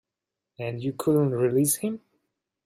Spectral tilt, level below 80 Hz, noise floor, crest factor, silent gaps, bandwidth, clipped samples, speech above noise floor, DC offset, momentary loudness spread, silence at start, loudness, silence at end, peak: -6 dB/octave; -68 dBFS; -87 dBFS; 16 dB; none; 15.5 kHz; under 0.1%; 62 dB; under 0.1%; 12 LU; 0.6 s; -25 LUFS; 0.7 s; -12 dBFS